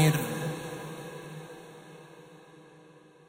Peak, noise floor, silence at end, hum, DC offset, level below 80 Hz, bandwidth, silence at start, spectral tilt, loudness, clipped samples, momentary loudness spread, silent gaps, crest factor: -10 dBFS; -55 dBFS; 0.3 s; none; under 0.1%; -68 dBFS; 16 kHz; 0 s; -5.5 dB/octave; -35 LUFS; under 0.1%; 22 LU; none; 22 dB